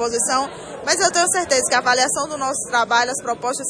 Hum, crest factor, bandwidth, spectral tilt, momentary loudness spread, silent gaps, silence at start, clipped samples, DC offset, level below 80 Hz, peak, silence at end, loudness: none; 16 dB; 10.5 kHz; -0.5 dB/octave; 7 LU; none; 0 s; under 0.1%; under 0.1%; -56 dBFS; -4 dBFS; 0 s; -18 LUFS